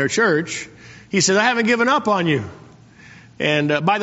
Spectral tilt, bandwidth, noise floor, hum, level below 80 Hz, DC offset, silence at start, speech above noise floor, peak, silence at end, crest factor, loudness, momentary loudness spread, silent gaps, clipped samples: -3 dB/octave; 8 kHz; -45 dBFS; none; -58 dBFS; under 0.1%; 0 s; 27 dB; -2 dBFS; 0 s; 18 dB; -18 LUFS; 12 LU; none; under 0.1%